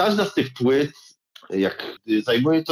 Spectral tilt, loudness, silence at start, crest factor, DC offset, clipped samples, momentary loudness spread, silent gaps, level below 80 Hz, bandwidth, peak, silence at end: -6 dB/octave; -22 LUFS; 0 s; 12 dB; under 0.1%; under 0.1%; 9 LU; none; -66 dBFS; 14 kHz; -10 dBFS; 0 s